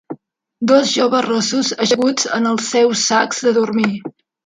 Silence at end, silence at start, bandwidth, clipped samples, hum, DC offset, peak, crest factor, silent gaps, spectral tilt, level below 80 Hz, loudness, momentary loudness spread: 0.35 s; 0.1 s; 9.6 kHz; under 0.1%; none; under 0.1%; 0 dBFS; 16 dB; none; -3 dB/octave; -64 dBFS; -15 LUFS; 10 LU